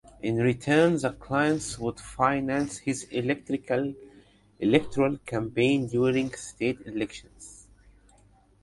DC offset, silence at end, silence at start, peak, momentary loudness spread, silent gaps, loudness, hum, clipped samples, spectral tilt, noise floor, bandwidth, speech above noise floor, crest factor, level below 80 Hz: under 0.1%; 1 s; 0.25 s; -6 dBFS; 11 LU; none; -27 LUFS; 50 Hz at -55 dBFS; under 0.1%; -5.5 dB/octave; -59 dBFS; 11.5 kHz; 33 dB; 22 dB; -54 dBFS